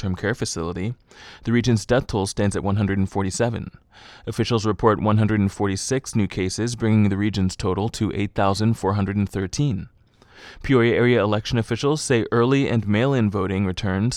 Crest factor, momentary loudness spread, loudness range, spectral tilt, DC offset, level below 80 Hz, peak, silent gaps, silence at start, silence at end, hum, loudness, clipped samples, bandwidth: 18 dB; 7 LU; 3 LU; -6 dB/octave; under 0.1%; -44 dBFS; -4 dBFS; none; 0 s; 0 s; none; -22 LUFS; under 0.1%; 12.5 kHz